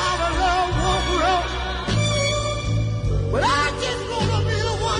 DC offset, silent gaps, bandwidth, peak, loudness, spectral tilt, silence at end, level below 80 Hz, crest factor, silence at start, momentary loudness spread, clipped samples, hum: under 0.1%; none; 10.5 kHz; -8 dBFS; -21 LUFS; -4.5 dB/octave; 0 s; -30 dBFS; 12 dB; 0 s; 4 LU; under 0.1%; none